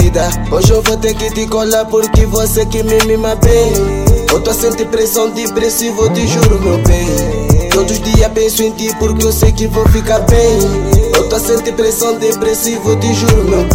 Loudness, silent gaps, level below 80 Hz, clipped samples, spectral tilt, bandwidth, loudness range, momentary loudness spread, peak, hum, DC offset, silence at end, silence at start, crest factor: -11 LUFS; none; -16 dBFS; under 0.1%; -5 dB/octave; 17 kHz; 1 LU; 4 LU; 0 dBFS; none; under 0.1%; 0 s; 0 s; 10 dB